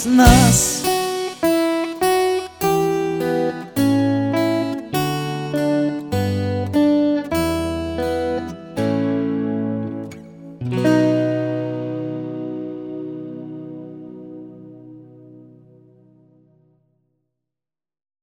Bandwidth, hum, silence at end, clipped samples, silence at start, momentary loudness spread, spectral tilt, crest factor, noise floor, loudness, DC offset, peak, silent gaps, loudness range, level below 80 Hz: over 20 kHz; none; 2.8 s; under 0.1%; 0 s; 17 LU; -5 dB/octave; 20 dB; -90 dBFS; -19 LUFS; under 0.1%; 0 dBFS; none; 14 LU; -34 dBFS